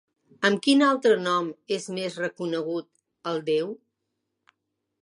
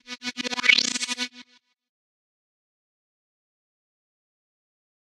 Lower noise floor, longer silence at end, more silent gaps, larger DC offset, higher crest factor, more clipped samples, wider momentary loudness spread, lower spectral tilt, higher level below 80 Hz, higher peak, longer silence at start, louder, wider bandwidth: first, -80 dBFS vs -55 dBFS; second, 1.25 s vs 3.6 s; neither; neither; second, 20 dB vs 30 dB; neither; about the same, 13 LU vs 14 LU; first, -4.5 dB/octave vs 1 dB/octave; about the same, -78 dBFS vs -80 dBFS; second, -6 dBFS vs -2 dBFS; first, 0.4 s vs 0.1 s; second, -25 LUFS vs -22 LUFS; second, 11.5 kHz vs 14.5 kHz